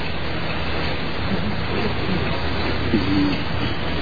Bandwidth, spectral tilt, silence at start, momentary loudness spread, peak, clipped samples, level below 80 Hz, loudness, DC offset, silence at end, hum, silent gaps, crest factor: 5 kHz; -7.5 dB/octave; 0 s; 5 LU; -4 dBFS; under 0.1%; -32 dBFS; -23 LUFS; 6%; 0 s; none; none; 18 dB